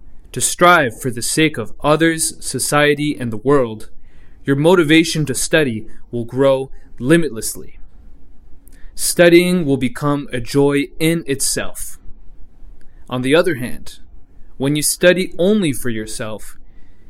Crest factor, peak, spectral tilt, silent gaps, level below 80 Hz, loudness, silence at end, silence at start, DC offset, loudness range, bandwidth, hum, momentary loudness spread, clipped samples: 16 dB; 0 dBFS; -4.5 dB/octave; none; -38 dBFS; -16 LUFS; 0 s; 0 s; under 0.1%; 5 LU; 16 kHz; none; 16 LU; under 0.1%